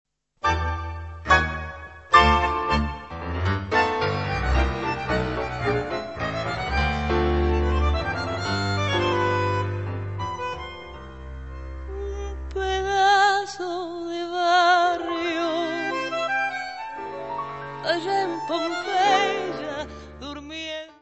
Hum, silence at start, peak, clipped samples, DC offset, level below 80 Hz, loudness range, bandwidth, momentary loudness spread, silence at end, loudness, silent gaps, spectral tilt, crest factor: none; 0.45 s; -2 dBFS; under 0.1%; 0.2%; -34 dBFS; 5 LU; 8.4 kHz; 15 LU; 0.1 s; -24 LUFS; none; -5 dB/octave; 22 dB